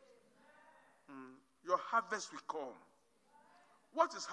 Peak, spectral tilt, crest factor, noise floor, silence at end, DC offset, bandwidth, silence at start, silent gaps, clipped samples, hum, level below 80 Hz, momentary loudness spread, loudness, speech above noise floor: -18 dBFS; -2 dB/octave; 24 dB; -71 dBFS; 0 s; under 0.1%; 11 kHz; 1.1 s; none; under 0.1%; none; under -90 dBFS; 21 LU; -39 LUFS; 32 dB